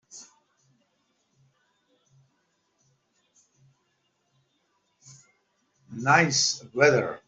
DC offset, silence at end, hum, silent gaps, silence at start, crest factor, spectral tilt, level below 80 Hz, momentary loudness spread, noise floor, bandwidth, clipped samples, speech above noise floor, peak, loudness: under 0.1%; 0.1 s; none; none; 0.15 s; 26 dB; -3 dB/octave; -72 dBFS; 25 LU; -73 dBFS; 8.2 kHz; under 0.1%; 50 dB; -4 dBFS; -22 LUFS